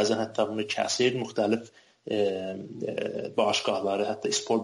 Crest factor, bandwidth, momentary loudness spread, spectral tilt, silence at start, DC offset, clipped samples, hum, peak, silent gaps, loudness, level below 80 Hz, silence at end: 16 dB; 11.5 kHz; 9 LU; -3.5 dB/octave; 0 s; under 0.1%; under 0.1%; none; -12 dBFS; none; -28 LUFS; -72 dBFS; 0 s